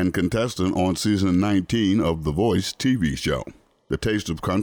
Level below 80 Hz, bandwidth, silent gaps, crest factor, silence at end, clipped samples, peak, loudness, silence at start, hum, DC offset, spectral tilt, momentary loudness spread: -42 dBFS; over 20 kHz; none; 12 dB; 0 s; under 0.1%; -12 dBFS; -23 LUFS; 0 s; none; under 0.1%; -5.5 dB/octave; 6 LU